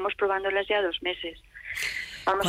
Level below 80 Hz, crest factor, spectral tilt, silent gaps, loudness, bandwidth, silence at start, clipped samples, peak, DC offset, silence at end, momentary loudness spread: -56 dBFS; 14 dB; -3 dB/octave; none; -28 LUFS; 16 kHz; 0 s; under 0.1%; -14 dBFS; under 0.1%; 0 s; 11 LU